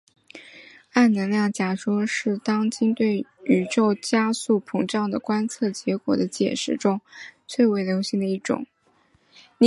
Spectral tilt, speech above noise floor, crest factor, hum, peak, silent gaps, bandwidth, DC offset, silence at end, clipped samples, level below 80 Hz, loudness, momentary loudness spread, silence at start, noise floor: -5.5 dB/octave; 40 dB; 20 dB; none; -4 dBFS; none; 11.5 kHz; under 0.1%; 0 s; under 0.1%; -68 dBFS; -23 LUFS; 8 LU; 0.35 s; -62 dBFS